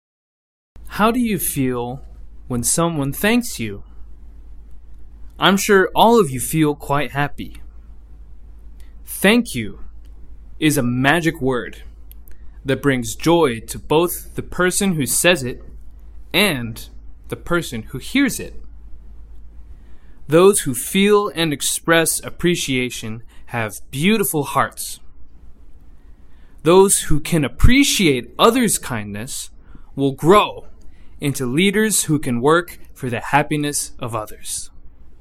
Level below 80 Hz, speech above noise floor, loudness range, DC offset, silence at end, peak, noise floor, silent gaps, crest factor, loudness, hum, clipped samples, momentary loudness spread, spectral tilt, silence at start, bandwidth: -34 dBFS; 21 dB; 6 LU; under 0.1%; 0.05 s; 0 dBFS; -39 dBFS; none; 20 dB; -18 LUFS; none; under 0.1%; 16 LU; -4 dB/octave; 0.75 s; 16.5 kHz